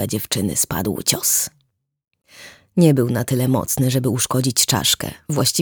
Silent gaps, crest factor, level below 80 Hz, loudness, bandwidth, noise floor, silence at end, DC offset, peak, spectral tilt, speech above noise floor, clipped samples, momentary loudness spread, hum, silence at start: none; 18 dB; -50 dBFS; -18 LUFS; over 20 kHz; -68 dBFS; 0 s; under 0.1%; -2 dBFS; -4 dB/octave; 49 dB; under 0.1%; 6 LU; none; 0 s